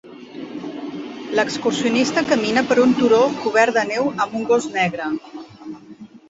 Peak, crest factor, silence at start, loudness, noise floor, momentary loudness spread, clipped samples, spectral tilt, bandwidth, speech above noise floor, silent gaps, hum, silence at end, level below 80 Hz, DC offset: -2 dBFS; 18 dB; 0.05 s; -18 LUFS; -41 dBFS; 21 LU; under 0.1%; -4.5 dB/octave; 8 kHz; 23 dB; none; none; 0.15 s; -62 dBFS; under 0.1%